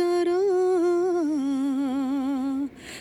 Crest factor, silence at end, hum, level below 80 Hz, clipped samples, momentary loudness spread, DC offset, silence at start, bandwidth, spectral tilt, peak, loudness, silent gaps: 8 dB; 0 s; none; -64 dBFS; under 0.1%; 6 LU; under 0.1%; 0 s; 12 kHz; -5 dB/octave; -16 dBFS; -25 LUFS; none